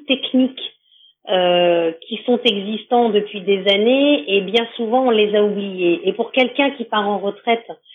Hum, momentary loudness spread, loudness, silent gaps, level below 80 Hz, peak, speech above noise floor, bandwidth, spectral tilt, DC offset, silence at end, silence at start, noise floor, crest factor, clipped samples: none; 7 LU; -17 LUFS; none; under -90 dBFS; -2 dBFS; 36 dB; 7 kHz; -6.5 dB/octave; under 0.1%; 0.2 s; 0.1 s; -54 dBFS; 16 dB; under 0.1%